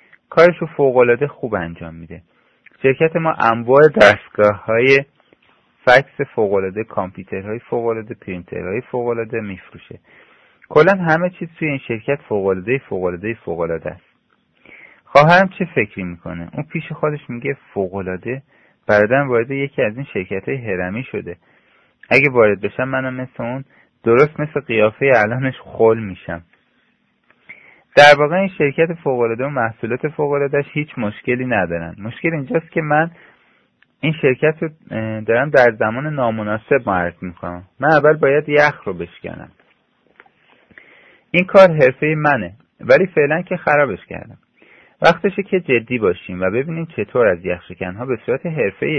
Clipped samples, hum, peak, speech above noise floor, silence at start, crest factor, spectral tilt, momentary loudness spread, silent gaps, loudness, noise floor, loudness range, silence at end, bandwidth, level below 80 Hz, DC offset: 0.1%; none; 0 dBFS; 45 dB; 0.3 s; 18 dB; -7 dB/octave; 15 LU; none; -16 LUFS; -62 dBFS; 6 LU; 0 s; 11 kHz; -54 dBFS; under 0.1%